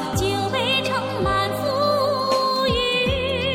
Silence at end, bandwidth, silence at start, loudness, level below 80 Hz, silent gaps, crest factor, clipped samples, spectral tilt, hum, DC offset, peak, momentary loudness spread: 0 s; 17 kHz; 0 s; -21 LUFS; -38 dBFS; none; 14 dB; under 0.1%; -4.5 dB/octave; none; under 0.1%; -8 dBFS; 3 LU